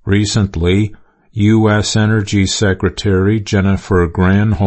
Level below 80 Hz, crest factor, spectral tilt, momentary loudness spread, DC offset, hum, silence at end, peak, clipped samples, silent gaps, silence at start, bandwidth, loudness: -32 dBFS; 12 dB; -6 dB/octave; 4 LU; under 0.1%; none; 0 s; -2 dBFS; under 0.1%; none; 0.05 s; 8.6 kHz; -14 LUFS